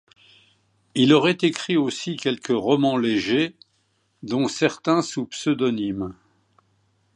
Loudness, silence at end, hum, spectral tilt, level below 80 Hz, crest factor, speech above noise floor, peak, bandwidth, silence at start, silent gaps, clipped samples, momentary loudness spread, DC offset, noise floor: -22 LUFS; 1.05 s; none; -5 dB/octave; -62 dBFS; 20 dB; 46 dB; -4 dBFS; 10.5 kHz; 0.95 s; none; under 0.1%; 11 LU; under 0.1%; -68 dBFS